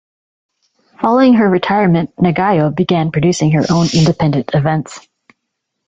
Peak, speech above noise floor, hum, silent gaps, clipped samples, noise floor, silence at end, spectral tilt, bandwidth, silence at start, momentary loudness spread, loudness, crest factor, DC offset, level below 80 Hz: 0 dBFS; 62 dB; none; none; under 0.1%; -74 dBFS; 0.9 s; -6.5 dB/octave; 8 kHz; 1 s; 6 LU; -13 LUFS; 14 dB; under 0.1%; -46 dBFS